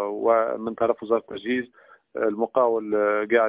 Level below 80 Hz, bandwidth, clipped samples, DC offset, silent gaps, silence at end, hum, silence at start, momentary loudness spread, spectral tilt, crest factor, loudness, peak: -66 dBFS; 4 kHz; under 0.1%; under 0.1%; none; 0 s; none; 0 s; 6 LU; -9 dB/octave; 18 dB; -24 LUFS; -6 dBFS